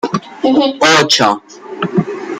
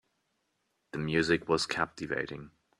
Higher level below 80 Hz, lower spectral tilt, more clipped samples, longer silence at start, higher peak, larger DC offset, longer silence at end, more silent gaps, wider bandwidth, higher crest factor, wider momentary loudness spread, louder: first, -56 dBFS vs -62 dBFS; about the same, -3.5 dB/octave vs -4.5 dB/octave; neither; second, 0.05 s vs 0.95 s; first, 0 dBFS vs -12 dBFS; neither; second, 0 s vs 0.3 s; neither; first, 16 kHz vs 13 kHz; second, 14 dB vs 22 dB; about the same, 14 LU vs 13 LU; first, -12 LUFS vs -31 LUFS